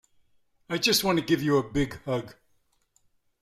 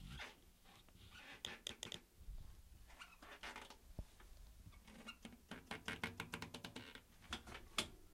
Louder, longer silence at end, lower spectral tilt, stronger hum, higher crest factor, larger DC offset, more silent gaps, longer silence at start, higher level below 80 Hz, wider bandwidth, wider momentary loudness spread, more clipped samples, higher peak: first, -26 LUFS vs -52 LUFS; first, 1.1 s vs 0 s; first, -4 dB/octave vs -2.5 dB/octave; neither; second, 20 dB vs 32 dB; neither; neither; first, 0.7 s vs 0 s; first, -52 dBFS vs -62 dBFS; about the same, 16 kHz vs 16 kHz; second, 11 LU vs 17 LU; neither; first, -10 dBFS vs -22 dBFS